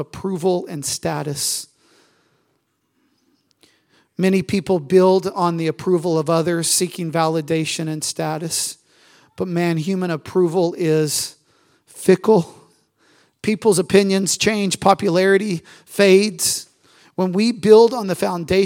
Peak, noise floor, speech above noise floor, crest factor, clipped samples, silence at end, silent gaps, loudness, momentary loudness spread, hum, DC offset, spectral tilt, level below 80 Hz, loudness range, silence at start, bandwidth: 0 dBFS; -68 dBFS; 50 dB; 20 dB; under 0.1%; 0 s; none; -18 LUFS; 10 LU; none; under 0.1%; -4.5 dB/octave; -58 dBFS; 9 LU; 0 s; 16.5 kHz